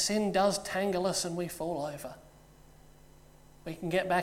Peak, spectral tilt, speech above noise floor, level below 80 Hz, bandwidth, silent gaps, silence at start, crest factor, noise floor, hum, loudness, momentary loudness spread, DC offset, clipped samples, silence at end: -14 dBFS; -4 dB/octave; 25 dB; -58 dBFS; 17 kHz; none; 0 s; 18 dB; -56 dBFS; none; -31 LUFS; 17 LU; under 0.1%; under 0.1%; 0 s